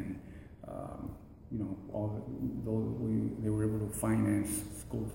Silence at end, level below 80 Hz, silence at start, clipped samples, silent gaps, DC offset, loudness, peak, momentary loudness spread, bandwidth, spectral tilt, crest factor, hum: 0 s; -52 dBFS; 0 s; under 0.1%; none; under 0.1%; -36 LUFS; -20 dBFS; 15 LU; 16.5 kHz; -7 dB/octave; 16 dB; none